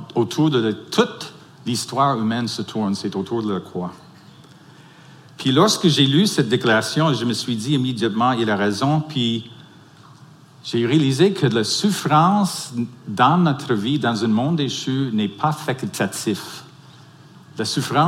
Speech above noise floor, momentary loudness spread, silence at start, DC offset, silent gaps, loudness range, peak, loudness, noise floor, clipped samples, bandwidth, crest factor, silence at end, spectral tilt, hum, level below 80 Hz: 27 dB; 12 LU; 0 s; under 0.1%; none; 6 LU; -2 dBFS; -20 LUFS; -46 dBFS; under 0.1%; 16.5 kHz; 20 dB; 0 s; -5 dB/octave; none; -64 dBFS